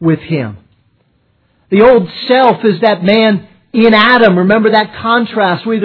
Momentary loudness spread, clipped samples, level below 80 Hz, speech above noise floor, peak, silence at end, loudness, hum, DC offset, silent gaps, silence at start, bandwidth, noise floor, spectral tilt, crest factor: 10 LU; 0.4%; -46 dBFS; 46 dB; 0 dBFS; 0 s; -10 LUFS; none; under 0.1%; none; 0 s; 5.4 kHz; -56 dBFS; -8.5 dB/octave; 10 dB